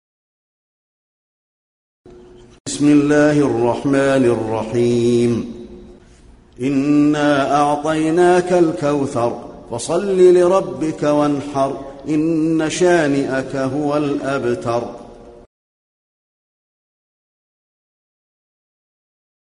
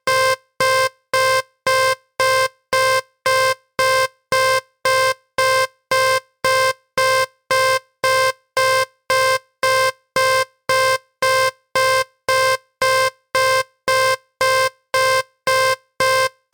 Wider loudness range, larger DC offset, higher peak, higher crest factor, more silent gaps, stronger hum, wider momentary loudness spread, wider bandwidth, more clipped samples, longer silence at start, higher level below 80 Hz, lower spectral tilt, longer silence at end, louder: first, 7 LU vs 1 LU; neither; first, -2 dBFS vs -8 dBFS; about the same, 16 dB vs 12 dB; first, 2.60-2.65 s vs none; neither; first, 10 LU vs 3 LU; second, 11 kHz vs 19 kHz; neither; first, 2.1 s vs 0.05 s; about the same, -50 dBFS vs -54 dBFS; first, -6 dB/octave vs -0.5 dB/octave; first, 4.25 s vs 0.25 s; about the same, -16 LUFS vs -18 LUFS